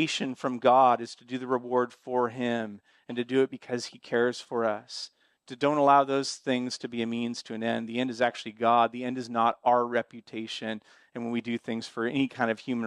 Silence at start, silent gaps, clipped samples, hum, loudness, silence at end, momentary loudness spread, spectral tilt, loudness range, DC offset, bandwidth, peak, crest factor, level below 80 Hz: 0 s; none; under 0.1%; none; -28 LUFS; 0 s; 14 LU; -4.5 dB/octave; 3 LU; under 0.1%; 11 kHz; -8 dBFS; 20 dB; -78 dBFS